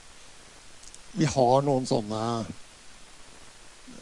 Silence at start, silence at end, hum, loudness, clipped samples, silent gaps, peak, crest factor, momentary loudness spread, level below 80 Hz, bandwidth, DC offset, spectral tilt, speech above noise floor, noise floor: 0.05 s; 0 s; none; -26 LUFS; under 0.1%; none; -8 dBFS; 22 dB; 27 LU; -56 dBFS; 11.5 kHz; under 0.1%; -6 dB/octave; 24 dB; -49 dBFS